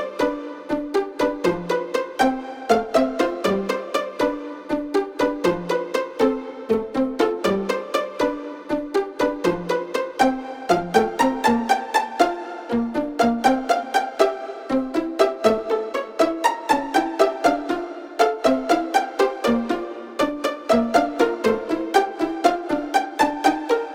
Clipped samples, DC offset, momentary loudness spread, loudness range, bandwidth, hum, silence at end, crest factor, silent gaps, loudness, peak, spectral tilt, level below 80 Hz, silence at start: under 0.1%; under 0.1%; 7 LU; 3 LU; 17 kHz; none; 0 s; 20 dB; none; -22 LUFS; -2 dBFS; -4.5 dB/octave; -52 dBFS; 0 s